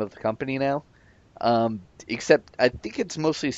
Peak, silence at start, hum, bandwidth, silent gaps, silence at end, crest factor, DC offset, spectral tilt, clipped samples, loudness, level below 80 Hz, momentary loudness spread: -2 dBFS; 0 s; none; 8.2 kHz; none; 0 s; 22 dB; under 0.1%; -5 dB/octave; under 0.1%; -25 LUFS; -58 dBFS; 10 LU